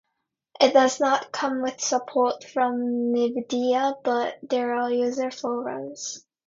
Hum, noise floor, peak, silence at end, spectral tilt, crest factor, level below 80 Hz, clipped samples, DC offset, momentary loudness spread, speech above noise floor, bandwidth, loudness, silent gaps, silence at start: none; -80 dBFS; -4 dBFS; 0.3 s; -2.5 dB/octave; 20 dB; -74 dBFS; under 0.1%; under 0.1%; 10 LU; 56 dB; 7.8 kHz; -24 LUFS; none; 0.6 s